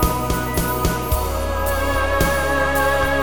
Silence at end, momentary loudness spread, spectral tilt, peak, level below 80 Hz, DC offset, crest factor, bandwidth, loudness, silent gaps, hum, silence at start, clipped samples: 0 s; 4 LU; -4.5 dB/octave; -2 dBFS; -26 dBFS; 2%; 16 dB; over 20 kHz; -20 LUFS; none; none; 0 s; under 0.1%